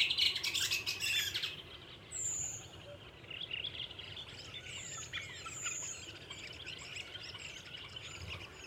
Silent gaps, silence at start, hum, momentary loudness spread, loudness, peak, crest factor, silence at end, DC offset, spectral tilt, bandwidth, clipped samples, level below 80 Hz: none; 0 s; none; 14 LU; -38 LUFS; -18 dBFS; 24 dB; 0 s; under 0.1%; 0 dB/octave; 19.5 kHz; under 0.1%; -64 dBFS